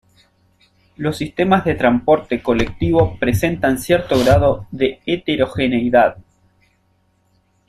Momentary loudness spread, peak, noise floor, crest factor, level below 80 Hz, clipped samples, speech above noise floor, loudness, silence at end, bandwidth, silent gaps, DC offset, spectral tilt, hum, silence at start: 7 LU; -2 dBFS; -61 dBFS; 16 dB; -38 dBFS; under 0.1%; 45 dB; -17 LUFS; 1.5 s; 14 kHz; none; under 0.1%; -6.5 dB/octave; none; 1 s